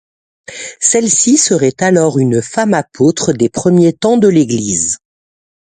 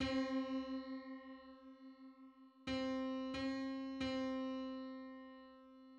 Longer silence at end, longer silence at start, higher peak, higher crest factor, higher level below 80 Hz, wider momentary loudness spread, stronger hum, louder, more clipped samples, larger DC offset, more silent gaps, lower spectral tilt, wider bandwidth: first, 0.85 s vs 0 s; first, 0.5 s vs 0 s; first, 0 dBFS vs -28 dBFS; about the same, 12 dB vs 16 dB; first, -50 dBFS vs -68 dBFS; second, 6 LU vs 18 LU; neither; first, -11 LUFS vs -44 LUFS; neither; neither; neither; about the same, -4.5 dB/octave vs -5.5 dB/octave; first, 9.6 kHz vs 8.2 kHz